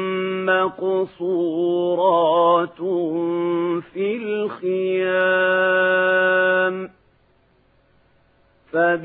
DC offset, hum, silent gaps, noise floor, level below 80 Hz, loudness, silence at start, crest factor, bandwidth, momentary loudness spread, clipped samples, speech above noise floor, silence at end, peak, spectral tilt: under 0.1%; none; none; -59 dBFS; -70 dBFS; -20 LUFS; 0 s; 14 dB; 4 kHz; 8 LU; under 0.1%; 40 dB; 0 s; -6 dBFS; -10 dB/octave